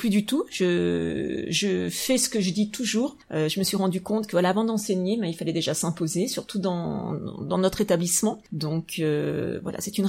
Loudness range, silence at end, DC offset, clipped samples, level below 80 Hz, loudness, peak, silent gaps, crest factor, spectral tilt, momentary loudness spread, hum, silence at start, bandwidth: 2 LU; 0 s; under 0.1%; under 0.1%; -58 dBFS; -26 LUFS; -8 dBFS; none; 18 dB; -4.5 dB/octave; 6 LU; none; 0 s; 16.5 kHz